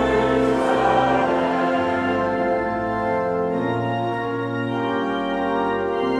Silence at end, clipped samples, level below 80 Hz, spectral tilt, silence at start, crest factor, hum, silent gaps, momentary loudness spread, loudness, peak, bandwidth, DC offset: 0 s; under 0.1%; -46 dBFS; -6.5 dB/octave; 0 s; 14 dB; none; none; 6 LU; -21 LUFS; -6 dBFS; 11 kHz; under 0.1%